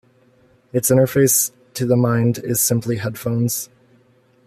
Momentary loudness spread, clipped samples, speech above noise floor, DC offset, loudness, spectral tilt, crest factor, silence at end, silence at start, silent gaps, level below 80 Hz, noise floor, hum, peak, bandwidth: 11 LU; under 0.1%; 38 dB; under 0.1%; -18 LUFS; -5 dB/octave; 16 dB; 0.8 s; 0.75 s; none; -56 dBFS; -56 dBFS; none; -2 dBFS; 15 kHz